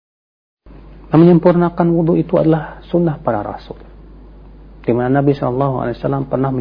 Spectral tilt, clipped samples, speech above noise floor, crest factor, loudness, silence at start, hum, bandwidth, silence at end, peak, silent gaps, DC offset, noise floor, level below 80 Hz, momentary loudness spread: -11.5 dB/octave; under 0.1%; 24 dB; 14 dB; -15 LUFS; 0.7 s; none; 5.2 kHz; 0 s; 0 dBFS; none; under 0.1%; -38 dBFS; -40 dBFS; 13 LU